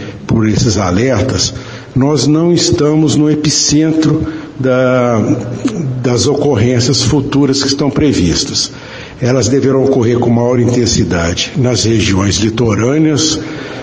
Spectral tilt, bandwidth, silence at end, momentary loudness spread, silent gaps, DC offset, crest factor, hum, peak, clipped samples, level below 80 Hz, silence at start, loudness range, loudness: -5 dB/octave; 10 kHz; 0 s; 6 LU; none; 0.2%; 10 dB; none; 0 dBFS; under 0.1%; -34 dBFS; 0 s; 1 LU; -12 LUFS